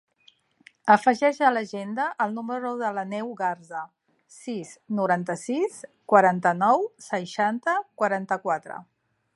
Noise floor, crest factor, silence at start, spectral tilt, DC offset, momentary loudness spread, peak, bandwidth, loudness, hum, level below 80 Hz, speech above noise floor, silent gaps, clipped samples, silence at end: -61 dBFS; 22 dB; 0.85 s; -5.5 dB/octave; under 0.1%; 16 LU; -4 dBFS; 11.5 kHz; -25 LUFS; none; -80 dBFS; 37 dB; none; under 0.1%; 0.55 s